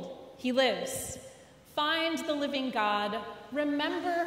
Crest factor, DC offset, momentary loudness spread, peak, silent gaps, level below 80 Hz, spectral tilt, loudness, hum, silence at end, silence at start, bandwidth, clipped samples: 16 dB; under 0.1%; 11 LU; -16 dBFS; none; -66 dBFS; -3 dB/octave; -31 LUFS; none; 0 s; 0 s; 16 kHz; under 0.1%